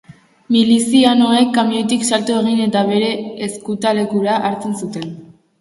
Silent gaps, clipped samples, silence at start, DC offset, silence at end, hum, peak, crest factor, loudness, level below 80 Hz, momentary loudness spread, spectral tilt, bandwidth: none; under 0.1%; 0.1 s; under 0.1%; 0.35 s; none; 0 dBFS; 16 dB; -15 LUFS; -60 dBFS; 12 LU; -4.5 dB/octave; 11.5 kHz